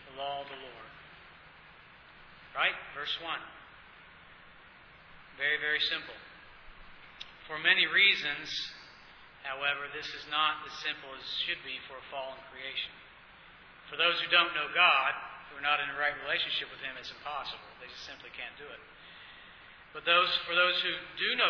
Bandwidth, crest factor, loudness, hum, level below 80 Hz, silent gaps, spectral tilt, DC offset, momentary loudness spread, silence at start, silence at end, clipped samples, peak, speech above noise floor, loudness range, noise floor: 5.4 kHz; 24 dB; -30 LUFS; none; -66 dBFS; none; -2 dB/octave; under 0.1%; 24 LU; 0 s; 0 s; under 0.1%; -10 dBFS; 24 dB; 9 LU; -55 dBFS